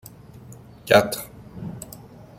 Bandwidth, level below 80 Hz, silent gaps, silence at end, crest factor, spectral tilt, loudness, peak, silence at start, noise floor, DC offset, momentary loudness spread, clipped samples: 16.5 kHz; -54 dBFS; none; 0.15 s; 24 dB; -4 dB/octave; -20 LUFS; -2 dBFS; 0.5 s; -44 dBFS; under 0.1%; 26 LU; under 0.1%